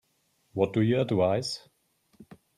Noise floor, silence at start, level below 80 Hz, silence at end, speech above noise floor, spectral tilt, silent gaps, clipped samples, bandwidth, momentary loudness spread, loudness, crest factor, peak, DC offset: -72 dBFS; 0.55 s; -66 dBFS; 0.25 s; 46 dB; -6.5 dB/octave; none; under 0.1%; 13.5 kHz; 13 LU; -27 LUFS; 18 dB; -12 dBFS; under 0.1%